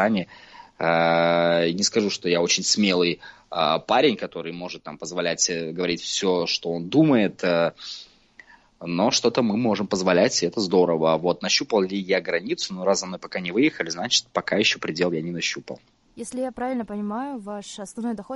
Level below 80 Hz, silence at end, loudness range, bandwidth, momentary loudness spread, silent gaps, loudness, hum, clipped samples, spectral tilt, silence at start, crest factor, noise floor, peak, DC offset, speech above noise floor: -62 dBFS; 0 s; 4 LU; 11.5 kHz; 14 LU; none; -23 LUFS; none; under 0.1%; -3.5 dB/octave; 0 s; 18 dB; -52 dBFS; -6 dBFS; under 0.1%; 29 dB